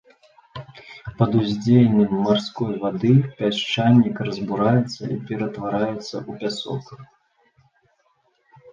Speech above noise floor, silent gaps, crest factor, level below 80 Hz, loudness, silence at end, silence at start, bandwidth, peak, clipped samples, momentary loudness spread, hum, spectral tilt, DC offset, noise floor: 45 dB; none; 18 dB; -56 dBFS; -21 LUFS; 1.7 s; 0.55 s; 7.6 kHz; -4 dBFS; under 0.1%; 19 LU; none; -7.5 dB/octave; under 0.1%; -65 dBFS